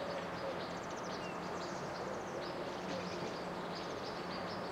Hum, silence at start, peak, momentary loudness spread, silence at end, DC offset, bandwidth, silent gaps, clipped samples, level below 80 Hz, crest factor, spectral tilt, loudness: none; 0 s; -28 dBFS; 1 LU; 0 s; under 0.1%; 16 kHz; none; under 0.1%; -68 dBFS; 12 dB; -4.5 dB/octave; -42 LUFS